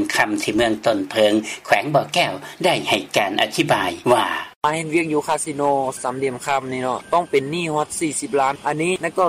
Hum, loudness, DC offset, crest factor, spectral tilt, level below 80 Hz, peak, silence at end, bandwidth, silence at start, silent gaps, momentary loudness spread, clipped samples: none; -20 LUFS; under 0.1%; 18 dB; -3.5 dB/octave; -56 dBFS; -2 dBFS; 0 s; 16 kHz; 0 s; 4.56-4.61 s; 5 LU; under 0.1%